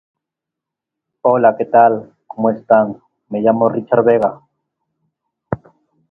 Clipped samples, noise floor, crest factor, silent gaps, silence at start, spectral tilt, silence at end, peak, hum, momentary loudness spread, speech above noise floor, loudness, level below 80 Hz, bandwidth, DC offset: under 0.1%; -83 dBFS; 16 dB; none; 1.25 s; -10 dB/octave; 0.55 s; 0 dBFS; none; 15 LU; 70 dB; -15 LUFS; -56 dBFS; 3.2 kHz; under 0.1%